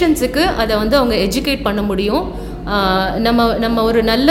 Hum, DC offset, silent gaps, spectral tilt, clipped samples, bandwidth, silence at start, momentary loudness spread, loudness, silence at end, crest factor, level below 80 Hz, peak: none; under 0.1%; none; -5 dB/octave; under 0.1%; 17 kHz; 0 s; 5 LU; -15 LUFS; 0 s; 14 dB; -28 dBFS; 0 dBFS